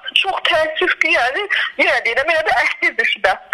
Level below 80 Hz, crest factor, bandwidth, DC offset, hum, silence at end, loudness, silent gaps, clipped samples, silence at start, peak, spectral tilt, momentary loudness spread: -52 dBFS; 16 dB; 13.5 kHz; under 0.1%; none; 0.1 s; -15 LUFS; none; under 0.1%; 0.05 s; 0 dBFS; -1.5 dB/octave; 3 LU